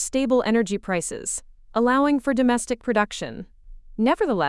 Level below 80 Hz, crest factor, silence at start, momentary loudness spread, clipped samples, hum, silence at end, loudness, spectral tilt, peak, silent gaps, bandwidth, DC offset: -48 dBFS; 16 dB; 0 s; 12 LU; under 0.1%; none; 0 s; -23 LUFS; -4 dB/octave; -8 dBFS; none; 12 kHz; under 0.1%